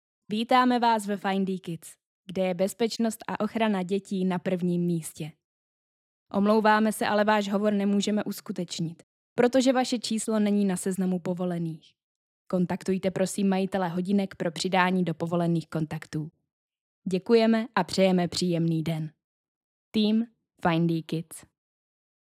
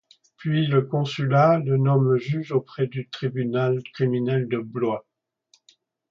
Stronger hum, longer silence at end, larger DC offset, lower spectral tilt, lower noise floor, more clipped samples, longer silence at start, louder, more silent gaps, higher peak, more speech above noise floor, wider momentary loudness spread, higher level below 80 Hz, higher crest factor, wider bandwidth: neither; second, 0.95 s vs 1.1 s; neither; second, -5.5 dB/octave vs -8.5 dB/octave; first, under -90 dBFS vs -64 dBFS; neither; about the same, 0.3 s vs 0.4 s; second, -27 LUFS vs -23 LUFS; first, 2.07-2.24 s, 5.44-6.26 s, 9.03-9.36 s, 12.03-12.45 s, 16.52-16.69 s, 16.81-17.02 s, 19.24-19.92 s vs none; about the same, -8 dBFS vs -6 dBFS; first, over 64 dB vs 42 dB; first, 12 LU vs 9 LU; about the same, -68 dBFS vs -66 dBFS; about the same, 20 dB vs 18 dB; first, 15 kHz vs 7 kHz